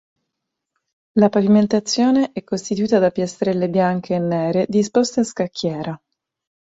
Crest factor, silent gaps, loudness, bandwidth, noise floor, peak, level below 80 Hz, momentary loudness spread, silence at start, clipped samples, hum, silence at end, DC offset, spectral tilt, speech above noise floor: 18 dB; none; -19 LUFS; 8 kHz; -80 dBFS; -2 dBFS; -60 dBFS; 9 LU; 1.15 s; under 0.1%; none; 0.7 s; under 0.1%; -6 dB/octave; 62 dB